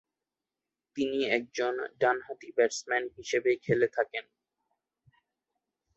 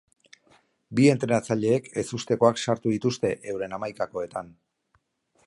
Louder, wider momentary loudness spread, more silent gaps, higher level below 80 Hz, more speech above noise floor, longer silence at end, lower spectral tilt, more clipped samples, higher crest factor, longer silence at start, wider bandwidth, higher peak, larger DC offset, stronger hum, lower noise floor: second, -30 LUFS vs -25 LUFS; second, 7 LU vs 12 LU; neither; second, -72 dBFS vs -64 dBFS; first, 60 dB vs 46 dB; first, 1.75 s vs 0.95 s; second, -4 dB/octave vs -6 dB/octave; neither; about the same, 20 dB vs 22 dB; about the same, 0.95 s vs 0.9 s; second, 8.2 kHz vs 11.5 kHz; second, -12 dBFS vs -6 dBFS; neither; neither; first, -90 dBFS vs -70 dBFS